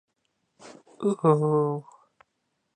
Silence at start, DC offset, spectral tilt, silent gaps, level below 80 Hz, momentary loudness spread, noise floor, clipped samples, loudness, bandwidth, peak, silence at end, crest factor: 0.65 s; under 0.1%; -9 dB/octave; none; -78 dBFS; 8 LU; -77 dBFS; under 0.1%; -25 LUFS; 9.6 kHz; -8 dBFS; 0.95 s; 20 dB